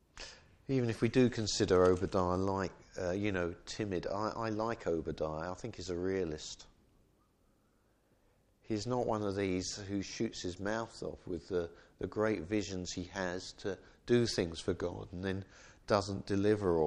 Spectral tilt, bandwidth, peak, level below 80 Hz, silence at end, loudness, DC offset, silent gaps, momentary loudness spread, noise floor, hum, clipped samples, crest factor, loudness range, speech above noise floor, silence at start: -5.5 dB/octave; 11 kHz; -14 dBFS; -58 dBFS; 0 s; -35 LUFS; under 0.1%; none; 13 LU; -72 dBFS; none; under 0.1%; 22 dB; 9 LU; 37 dB; 0.15 s